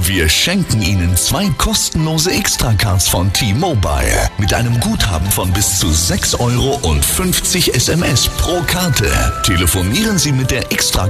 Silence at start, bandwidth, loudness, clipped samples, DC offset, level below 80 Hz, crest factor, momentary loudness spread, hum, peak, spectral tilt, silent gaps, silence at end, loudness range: 0 s; 15 kHz; -13 LUFS; under 0.1%; under 0.1%; -24 dBFS; 14 dB; 3 LU; none; 0 dBFS; -3.5 dB/octave; none; 0 s; 1 LU